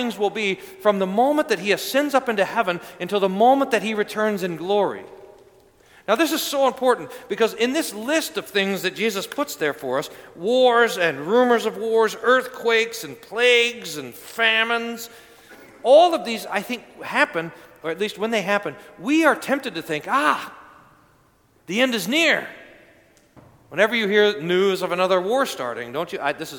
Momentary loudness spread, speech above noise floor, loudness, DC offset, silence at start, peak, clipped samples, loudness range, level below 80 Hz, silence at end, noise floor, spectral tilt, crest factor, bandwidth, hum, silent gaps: 12 LU; 38 dB; -21 LUFS; under 0.1%; 0 s; -2 dBFS; under 0.1%; 4 LU; -68 dBFS; 0 s; -59 dBFS; -3.5 dB/octave; 20 dB; 19 kHz; none; none